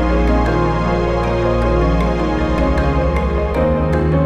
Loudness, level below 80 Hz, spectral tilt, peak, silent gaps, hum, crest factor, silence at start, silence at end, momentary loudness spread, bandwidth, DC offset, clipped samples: -16 LUFS; -20 dBFS; -8 dB/octave; -4 dBFS; none; none; 12 dB; 0 s; 0 s; 2 LU; 8 kHz; under 0.1%; under 0.1%